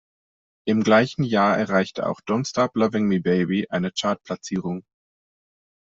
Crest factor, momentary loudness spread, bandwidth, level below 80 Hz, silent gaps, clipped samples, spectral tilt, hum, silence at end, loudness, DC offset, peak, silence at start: 18 dB; 10 LU; 7.8 kHz; -62 dBFS; none; under 0.1%; -6 dB/octave; none; 1.05 s; -22 LUFS; under 0.1%; -4 dBFS; 0.65 s